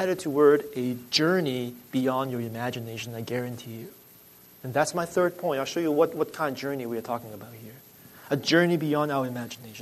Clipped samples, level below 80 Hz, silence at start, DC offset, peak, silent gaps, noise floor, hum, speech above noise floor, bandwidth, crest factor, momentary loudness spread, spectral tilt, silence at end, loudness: under 0.1%; -70 dBFS; 0 s; under 0.1%; -8 dBFS; none; -53 dBFS; none; 26 dB; 13.5 kHz; 20 dB; 18 LU; -5 dB/octave; 0 s; -27 LUFS